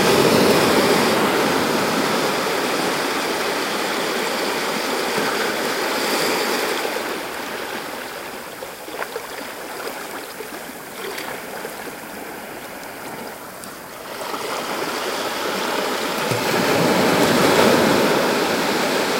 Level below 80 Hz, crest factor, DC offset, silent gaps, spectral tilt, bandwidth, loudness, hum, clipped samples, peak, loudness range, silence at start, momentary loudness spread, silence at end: -56 dBFS; 20 dB; under 0.1%; none; -3.5 dB/octave; 16 kHz; -20 LUFS; none; under 0.1%; -2 dBFS; 13 LU; 0 s; 17 LU; 0 s